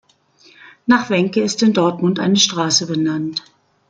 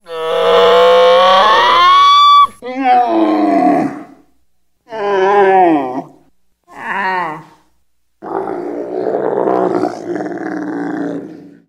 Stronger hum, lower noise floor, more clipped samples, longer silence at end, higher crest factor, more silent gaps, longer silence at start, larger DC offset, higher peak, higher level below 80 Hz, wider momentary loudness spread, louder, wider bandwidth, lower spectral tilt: neither; second, -52 dBFS vs -65 dBFS; neither; first, 0.5 s vs 0.2 s; about the same, 16 dB vs 12 dB; neither; first, 0.65 s vs 0.1 s; neither; about the same, -2 dBFS vs 0 dBFS; about the same, -62 dBFS vs -58 dBFS; second, 9 LU vs 15 LU; second, -16 LUFS vs -11 LUFS; second, 9.4 kHz vs 16 kHz; about the same, -4 dB/octave vs -4.5 dB/octave